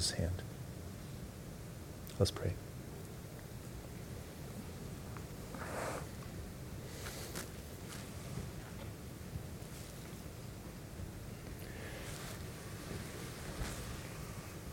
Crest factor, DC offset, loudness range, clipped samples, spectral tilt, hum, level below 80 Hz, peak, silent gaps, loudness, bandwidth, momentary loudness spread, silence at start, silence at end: 28 dB; under 0.1%; 5 LU; under 0.1%; -4.5 dB/octave; none; -54 dBFS; -16 dBFS; none; -45 LUFS; 17 kHz; 7 LU; 0 s; 0 s